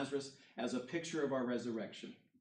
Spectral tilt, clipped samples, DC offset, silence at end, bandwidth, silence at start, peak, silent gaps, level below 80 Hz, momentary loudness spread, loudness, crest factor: -5 dB/octave; under 0.1%; under 0.1%; 0.25 s; 10 kHz; 0 s; -24 dBFS; none; -88 dBFS; 12 LU; -41 LUFS; 16 dB